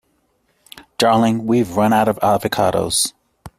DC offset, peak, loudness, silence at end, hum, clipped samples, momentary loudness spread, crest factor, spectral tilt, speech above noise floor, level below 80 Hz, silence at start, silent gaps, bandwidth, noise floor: under 0.1%; -2 dBFS; -17 LUFS; 0.1 s; none; under 0.1%; 4 LU; 16 dB; -4.5 dB/octave; 48 dB; -52 dBFS; 0.75 s; none; 16 kHz; -64 dBFS